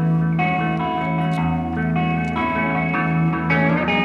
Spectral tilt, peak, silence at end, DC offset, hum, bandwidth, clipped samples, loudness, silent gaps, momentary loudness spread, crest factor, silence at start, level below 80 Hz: -8.5 dB/octave; -6 dBFS; 0 s; under 0.1%; none; 5.4 kHz; under 0.1%; -20 LUFS; none; 4 LU; 12 dB; 0 s; -42 dBFS